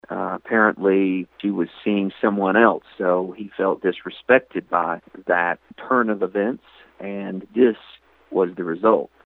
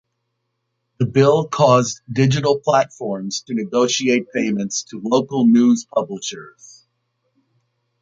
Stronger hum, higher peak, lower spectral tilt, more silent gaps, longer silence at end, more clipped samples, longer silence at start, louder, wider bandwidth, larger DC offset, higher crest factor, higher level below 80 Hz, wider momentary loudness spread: neither; about the same, 0 dBFS vs -2 dBFS; first, -9 dB/octave vs -5.5 dB/octave; neither; second, 0.2 s vs 1.5 s; neither; second, 0.1 s vs 1 s; second, -21 LUFS vs -18 LUFS; second, 4.2 kHz vs 7.8 kHz; neither; about the same, 20 dB vs 18 dB; second, -66 dBFS vs -60 dBFS; first, 13 LU vs 10 LU